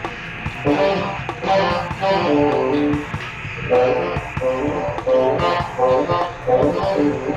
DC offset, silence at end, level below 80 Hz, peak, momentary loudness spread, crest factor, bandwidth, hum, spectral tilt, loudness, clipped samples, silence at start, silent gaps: under 0.1%; 0 s; -40 dBFS; -6 dBFS; 8 LU; 14 dB; 9 kHz; none; -6.5 dB/octave; -19 LUFS; under 0.1%; 0 s; none